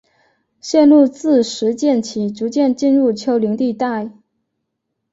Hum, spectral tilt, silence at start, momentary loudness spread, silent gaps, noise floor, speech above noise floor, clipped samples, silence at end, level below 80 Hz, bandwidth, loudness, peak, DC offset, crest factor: none; -5.5 dB/octave; 0.65 s; 11 LU; none; -75 dBFS; 60 dB; under 0.1%; 1 s; -62 dBFS; 8 kHz; -16 LUFS; -2 dBFS; under 0.1%; 14 dB